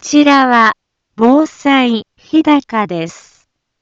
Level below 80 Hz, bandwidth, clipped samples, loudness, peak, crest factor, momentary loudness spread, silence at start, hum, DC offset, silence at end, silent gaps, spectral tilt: -56 dBFS; 7.8 kHz; under 0.1%; -12 LUFS; 0 dBFS; 12 dB; 12 LU; 0.05 s; none; under 0.1%; 0.7 s; none; -4 dB/octave